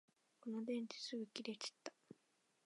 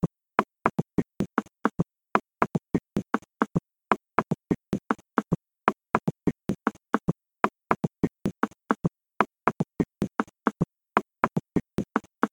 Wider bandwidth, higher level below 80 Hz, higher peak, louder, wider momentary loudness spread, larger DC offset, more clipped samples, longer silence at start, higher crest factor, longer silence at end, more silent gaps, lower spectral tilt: second, 11 kHz vs 17 kHz; second, under -90 dBFS vs -54 dBFS; second, -28 dBFS vs 0 dBFS; second, -48 LUFS vs -29 LUFS; first, 22 LU vs 4 LU; neither; neither; first, 0.45 s vs 0.05 s; second, 22 dB vs 28 dB; first, 0.5 s vs 0.05 s; neither; second, -3.5 dB/octave vs -7.5 dB/octave